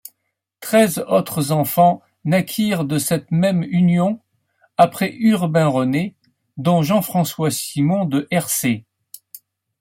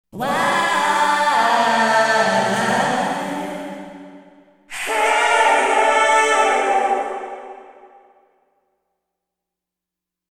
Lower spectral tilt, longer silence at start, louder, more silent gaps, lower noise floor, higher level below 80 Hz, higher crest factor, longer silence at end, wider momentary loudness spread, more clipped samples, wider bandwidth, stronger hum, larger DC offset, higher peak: first, -5.5 dB/octave vs -2.5 dB/octave; first, 0.6 s vs 0.15 s; about the same, -18 LUFS vs -17 LUFS; neither; second, -76 dBFS vs -85 dBFS; about the same, -60 dBFS vs -64 dBFS; about the same, 18 dB vs 18 dB; second, 0.45 s vs 2.6 s; second, 8 LU vs 16 LU; neither; about the same, 16.5 kHz vs 17 kHz; neither; neither; about the same, -2 dBFS vs -2 dBFS